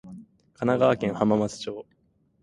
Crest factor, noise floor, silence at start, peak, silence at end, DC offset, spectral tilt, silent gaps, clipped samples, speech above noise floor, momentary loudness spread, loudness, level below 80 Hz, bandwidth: 20 dB; -47 dBFS; 0.05 s; -6 dBFS; 0.6 s; under 0.1%; -6.5 dB/octave; none; under 0.1%; 23 dB; 17 LU; -25 LUFS; -60 dBFS; 11 kHz